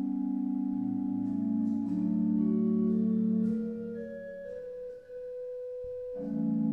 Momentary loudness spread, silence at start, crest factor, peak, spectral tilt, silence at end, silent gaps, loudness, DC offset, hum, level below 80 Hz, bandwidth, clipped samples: 13 LU; 0 s; 12 dB; -20 dBFS; -11.5 dB/octave; 0 s; none; -32 LUFS; under 0.1%; none; -66 dBFS; 2.4 kHz; under 0.1%